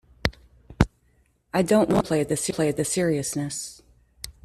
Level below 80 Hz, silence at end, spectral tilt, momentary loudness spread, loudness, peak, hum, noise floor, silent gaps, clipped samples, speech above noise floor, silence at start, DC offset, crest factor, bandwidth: -42 dBFS; 0.15 s; -5 dB/octave; 12 LU; -24 LUFS; -2 dBFS; none; -64 dBFS; none; under 0.1%; 41 dB; 0.25 s; under 0.1%; 24 dB; 14.5 kHz